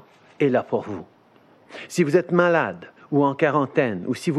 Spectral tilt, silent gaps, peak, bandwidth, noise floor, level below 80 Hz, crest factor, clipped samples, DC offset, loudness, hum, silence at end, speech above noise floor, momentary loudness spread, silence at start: -6.5 dB/octave; none; -4 dBFS; 13 kHz; -55 dBFS; -72 dBFS; 18 dB; under 0.1%; under 0.1%; -22 LUFS; none; 0 s; 33 dB; 17 LU; 0.4 s